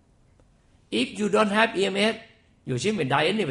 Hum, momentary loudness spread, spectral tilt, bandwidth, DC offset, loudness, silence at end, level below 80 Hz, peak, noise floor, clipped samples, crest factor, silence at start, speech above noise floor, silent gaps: none; 10 LU; -4.5 dB/octave; 11.5 kHz; under 0.1%; -24 LUFS; 0 s; -60 dBFS; -6 dBFS; -59 dBFS; under 0.1%; 20 dB; 0.9 s; 36 dB; none